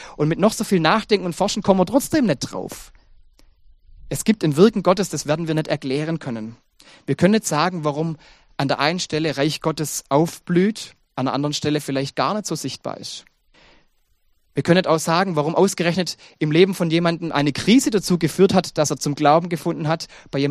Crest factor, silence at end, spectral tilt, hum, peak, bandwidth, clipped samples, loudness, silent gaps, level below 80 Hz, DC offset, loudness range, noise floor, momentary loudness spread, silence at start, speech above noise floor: 20 dB; 0 s; -5 dB/octave; none; 0 dBFS; 15 kHz; under 0.1%; -20 LUFS; none; -52 dBFS; under 0.1%; 5 LU; -62 dBFS; 12 LU; 0 s; 42 dB